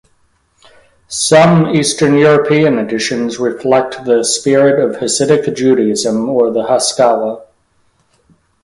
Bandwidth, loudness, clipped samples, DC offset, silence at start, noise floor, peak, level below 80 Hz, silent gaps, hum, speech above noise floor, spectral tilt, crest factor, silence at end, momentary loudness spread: 11.5 kHz; -12 LUFS; under 0.1%; under 0.1%; 1.1 s; -57 dBFS; 0 dBFS; -52 dBFS; none; none; 45 dB; -4.5 dB/octave; 12 dB; 1.2 s; 8 LU